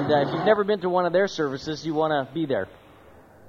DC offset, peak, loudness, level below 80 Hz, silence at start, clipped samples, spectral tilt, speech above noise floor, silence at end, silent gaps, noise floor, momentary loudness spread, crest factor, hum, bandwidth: under 0.1%; -6 dBFS; -24 LUFS; -60 dBFS; 0 s; under 0.1%; -6 dB/octave; 27 dB; 0 s; none; -50 dBFS; 7 LU; 18 dB; none; 7.4 kHz